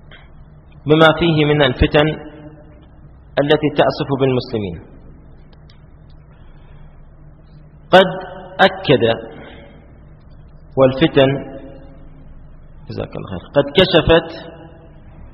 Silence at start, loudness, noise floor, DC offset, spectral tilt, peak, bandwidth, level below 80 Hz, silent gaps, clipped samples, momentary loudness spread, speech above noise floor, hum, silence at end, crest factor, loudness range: 0.85 s; -15 LUFS; -42 dBFS; under 0.1%; -4 dB/octave; 0 dBFS; 6 kHz; -36 dBFS; none; under 0.1%; 21 LU; 27 dB; none; 0.05 s; 18 dB; 4 LU